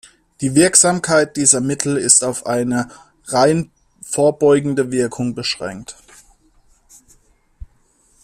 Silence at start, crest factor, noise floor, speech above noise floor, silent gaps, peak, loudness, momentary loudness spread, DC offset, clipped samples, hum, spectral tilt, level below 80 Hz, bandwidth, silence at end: 0.4 s; 18 dB; -57 dBFS; 41 dB; none; 0 dBFS; -15 LUFS; 14 LU; under 0.1%; under 0.1%; none; -3.5 dB/octave; -50 dBFS; 15.5 kHz; 2.3 s